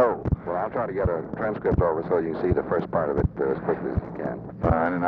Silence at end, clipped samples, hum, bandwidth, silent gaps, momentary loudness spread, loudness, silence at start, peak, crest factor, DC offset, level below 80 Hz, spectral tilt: 0 s; under 0.1%; none; 5.4 kHz; none; 6 LU; -26 LUFS; 0 s; -8 dBFS; 16 dB; under 0.1%; -38 dBFS; -11 dB/octave